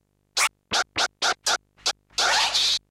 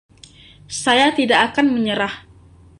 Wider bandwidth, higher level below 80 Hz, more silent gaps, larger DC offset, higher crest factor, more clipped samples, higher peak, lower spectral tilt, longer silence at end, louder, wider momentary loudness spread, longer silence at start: first, 16 kHz vs 11.5 kHz; second, -58 dBFS vs -52 dBFS; neither; neither; about the same, 16 dB vs 18 dB; neither; second, -10 dBFS vs -2 dBFS; second, 1.5 dB/octave vs -3 dB/octave; second, 0.1 s vs 0.6 s; second, -23 LUFS vs -17 LUFS; second, 8 LU vs 12 LU; second, 0.35 s vs 0.7 s